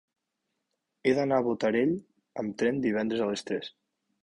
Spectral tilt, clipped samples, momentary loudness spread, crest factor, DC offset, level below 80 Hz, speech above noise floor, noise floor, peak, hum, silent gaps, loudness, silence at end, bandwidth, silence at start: -6 dB/octave; under 0.1%; 10 LU; 18 dB; under 0.1%; -68 dBFS; 55 dB; -82 dBFS; -12 dBFS; none; none; -29 LUFS; 0.55 s; 11 kHz; 1.05 s